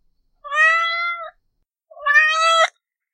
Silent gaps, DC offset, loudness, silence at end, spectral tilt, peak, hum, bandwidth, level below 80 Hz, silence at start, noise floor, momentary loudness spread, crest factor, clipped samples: none; under 0.1%; -16 LUFS; 0.45 s; 5 dB/octave; -2 dBFS; none; 12.5 kHz; -68 dBFS; 0.45 s; -71 dBFS; 12 LU; 18 dB; under 0.1%